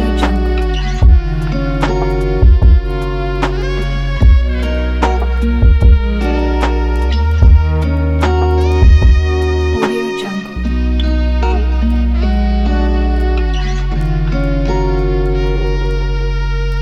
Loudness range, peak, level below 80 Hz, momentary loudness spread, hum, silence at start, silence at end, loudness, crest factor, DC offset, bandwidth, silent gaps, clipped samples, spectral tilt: 3 LU; 0 dBFS; -12 dBFS; 8 LU; none; 0 s; 0 s; -14 LUFS; 12 dB; under 0.1%; 7.2 kHz; none; under 0.1%; -7.5 dB/octave